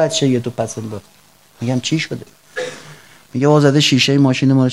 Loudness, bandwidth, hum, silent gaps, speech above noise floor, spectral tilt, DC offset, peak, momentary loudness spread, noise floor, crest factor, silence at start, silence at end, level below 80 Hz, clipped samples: -15 LUFS; 13 kHz; none; none; 27 dB; -5 dB/octave; 0.2%; 0 dBFS; 18 LU; -41 dBFS; 16 dB; 0 s; 0 s; -60 dBFS; under 0.1%